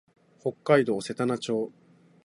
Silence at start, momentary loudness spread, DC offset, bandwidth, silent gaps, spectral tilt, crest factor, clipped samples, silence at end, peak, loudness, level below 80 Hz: 0.45 s; 12 LU; under 0.1%; 11.5 kHz; none; -6 dB/octave; 22 dB; under 0.1%; 0.55 s; -6 dBFS; -27 LUFS; -72 dBFS